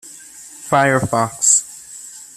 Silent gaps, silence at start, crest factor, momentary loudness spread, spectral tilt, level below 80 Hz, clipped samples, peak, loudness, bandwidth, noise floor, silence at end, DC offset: none; 0.05 s; 18 dB; 23 LU; -3 dB/octave; -54 dBFS; under 0.1%; 0 dBFS; -15 LUFS; 15 kHz; -39 dBFS; 0.1 s; under 0.1%